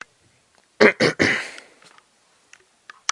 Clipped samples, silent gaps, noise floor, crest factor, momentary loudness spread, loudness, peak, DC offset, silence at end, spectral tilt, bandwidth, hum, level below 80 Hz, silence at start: under 0.1%; none; -61 dBFS; 24 dB; 19 LU; -18 LUFS; 0 dBFS; under 0.1%; 1.55 s; -3.5 dB/octave; 11.5 kHz; none; -68 dBFS; 0.8 s